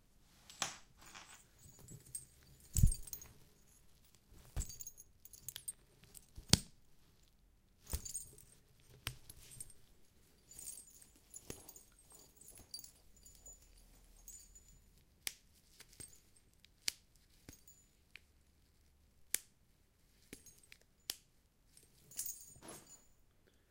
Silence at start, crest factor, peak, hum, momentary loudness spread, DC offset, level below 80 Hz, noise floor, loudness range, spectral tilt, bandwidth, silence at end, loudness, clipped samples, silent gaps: 0.5 s; 46 dB; 0 dBFS; none; 21 LU; under 0.1%; -52 dBFS; -72 dBFS; 13 LU; -3 dB/octave; 16.5 kHz; 0.75 s; -44 LUFS; under 0.1%; none